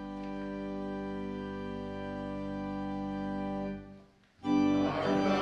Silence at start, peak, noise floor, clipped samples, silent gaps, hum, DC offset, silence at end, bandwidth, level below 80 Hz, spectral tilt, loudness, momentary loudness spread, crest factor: 0 s; -18 dBFS; -57 dBFS; under 0.1%; none; 50 Hz at -65 dBFS; under 0.1%; 0 s; 8 kHz; -54 dBFS; -7 dB/octave; -35 LUFS; 11 LU; 16 dB